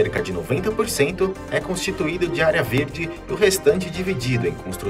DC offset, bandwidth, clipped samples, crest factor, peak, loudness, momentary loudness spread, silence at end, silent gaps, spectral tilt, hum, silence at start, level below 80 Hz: under 0.1%; 16 kHz; under 0.1%; 18 dB; -4 dBFS; -22 LUFS; 7 LU; 0 s; none; -5 dB/octave; none; 0 s; -42 dBFS